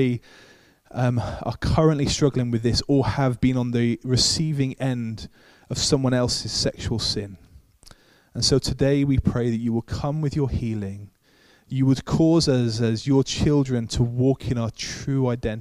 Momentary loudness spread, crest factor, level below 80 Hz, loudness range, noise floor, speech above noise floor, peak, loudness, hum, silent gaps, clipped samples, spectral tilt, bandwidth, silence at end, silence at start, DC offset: 10 LU; 18 dB; -40 dBFS; 3 LU; -57 dBFS; 35 dB; -6 dBFS; -23 LUFS; none; none; under 0.1%; -5.5 dB/octave; 13 kHz; 0 s; 0 s; under 0.1%